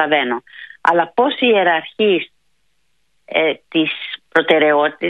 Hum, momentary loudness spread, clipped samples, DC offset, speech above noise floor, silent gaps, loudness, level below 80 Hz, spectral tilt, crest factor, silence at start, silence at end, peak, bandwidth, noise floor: none; 9 LU; under 0.1%; under 0.1%; 52 dB; none; -16 LUFS; -68 dBFS; -6 dB/octave; 16 dB; 0 s; 0 s; 0 dBFS; 8.6 kHz; -68 dBFS